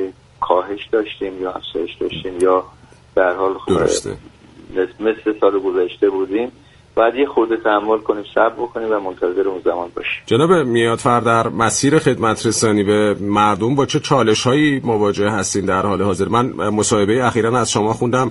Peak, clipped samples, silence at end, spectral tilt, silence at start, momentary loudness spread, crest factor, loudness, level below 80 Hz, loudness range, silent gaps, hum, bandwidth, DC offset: 0 dBFS; under 0.1%; 0 s; -5 dB/octave; 0 s; 9 LU; 16 dB; -17 LUFS; -48 dBFS; 4 LU; none; none; 11.5 kHz; under 0.1%